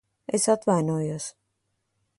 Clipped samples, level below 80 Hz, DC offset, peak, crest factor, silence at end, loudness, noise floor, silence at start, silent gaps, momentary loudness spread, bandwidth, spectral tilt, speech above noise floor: under 0.1%; -68 dBFS; under 0.1%; -8 dBFS; 18 dB; 0.9 s; -25 LUFS; -76 dBFS; 0.3 s; none; 12 LU; 11.5 kHz; -5.5 dB/octave; 52 dB